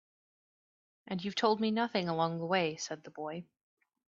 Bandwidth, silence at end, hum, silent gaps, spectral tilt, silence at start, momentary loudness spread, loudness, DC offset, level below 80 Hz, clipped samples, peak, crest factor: 7.8 kHz; 0.65 s; none; none; -5 dB/octave; 1.05 s; 12 LU; -34 LUFS; under 0.1%; -80 dBFS; under 0.1%; -14 dBFS; 22 dB